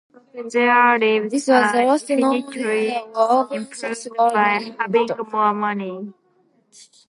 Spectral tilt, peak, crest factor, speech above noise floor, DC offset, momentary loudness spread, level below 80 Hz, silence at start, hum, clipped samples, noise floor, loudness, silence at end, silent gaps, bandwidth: -4 dB/octave; -2 dBFS; 18 dB; 42 dB; under 0.1%; 12 LU; -78 dBFS; 0.35 s; none; under 0.1%; -61 dBFS; -19 LUFS; 0.95 s; none; 11.5 kHz